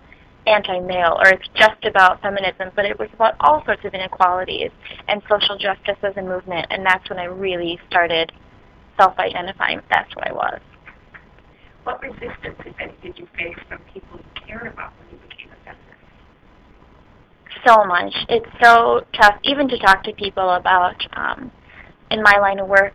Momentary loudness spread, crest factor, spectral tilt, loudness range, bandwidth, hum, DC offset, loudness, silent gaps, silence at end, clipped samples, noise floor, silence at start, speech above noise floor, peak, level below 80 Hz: 19 LU; 20 dB; -4 dB/octave; 18 LU; 16 kHz; none; under 0.1%; -17 LUFS; none; 0.05 s; under 0.1%; -50 dBFS; 0.45 s; 32 dB; 0 dBFS; -48 dBFS